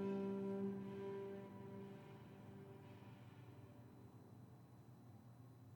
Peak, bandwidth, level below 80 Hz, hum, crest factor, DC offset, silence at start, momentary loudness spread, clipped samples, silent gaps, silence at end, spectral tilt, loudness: -34 dBFS; 19 kHz; -84 dBFS; none; 16 dB; under 0.1%; 0 s; 18 LU; under 0.1%; none; 0 s; -8.5 dB/octave; -52 LUFS